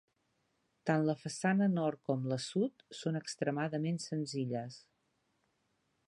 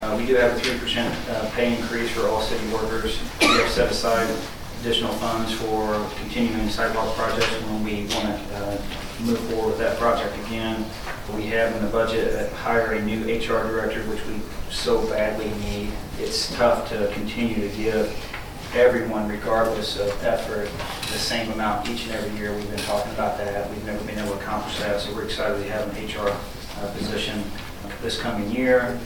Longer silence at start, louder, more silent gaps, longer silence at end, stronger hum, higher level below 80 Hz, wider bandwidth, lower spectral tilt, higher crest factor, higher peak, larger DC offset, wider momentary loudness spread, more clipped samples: first, 0.85 s vs 0 s; second, -36 LUFS vs -24 LUFS; neither; first, 1.3 s vs 0 s; neither; second, -82 dBFS vs -38 dBFS; second, 11 kHz vs 19 kHz; first, -6 dB/octave vs -4.5 dB/octave; about the same, 20 dB vs 20 dB; second, -16 dBFS vs -4 dBFS; neither; about the same, 10 LU vs 10 LU; neither